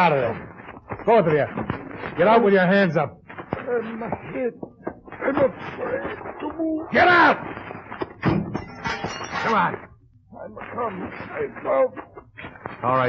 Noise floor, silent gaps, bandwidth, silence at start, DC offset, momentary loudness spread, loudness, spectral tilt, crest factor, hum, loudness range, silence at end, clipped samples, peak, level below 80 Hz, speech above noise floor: -47 dBFS; none; 7.4 kHz; 0 s; under 0.1%; 20 LU; -22 LUFS; -7 dB/octave; 18 dB; none; 7 LU; 0 s; under 0.1%; -4 dBFS; -52 dBFS; 26 dB